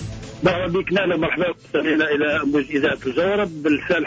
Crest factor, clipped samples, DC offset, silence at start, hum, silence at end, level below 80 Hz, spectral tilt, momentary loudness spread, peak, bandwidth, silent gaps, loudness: 14 dB; under 0.1%; under 0.1%; 0 s; none; 0 s; -46 dBFS; -6.5 dB/octave; 3 LU; -8 dBFS; 8 kHz; none; -20 LUFS